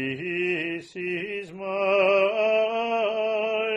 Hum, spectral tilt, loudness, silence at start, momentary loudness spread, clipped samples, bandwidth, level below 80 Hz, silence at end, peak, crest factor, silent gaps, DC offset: none; -5.5 dB/octave; -25 LUFS; 0 s; 11 LU; under 0.1%; 9.6 kHz; -70 dBFS; 0 s; -10 dBFS; 16 dB; none; under 0.1%